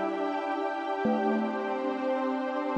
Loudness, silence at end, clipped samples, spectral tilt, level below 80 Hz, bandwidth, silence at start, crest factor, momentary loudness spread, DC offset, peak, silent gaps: -30 LUFS; 0 s; under 0.1%; -6.5 dB/octave; -76 dBFS; 8.4 kHz; 0 s; 14 dB; 4 LU; under 0.1%; -14 dBFS; none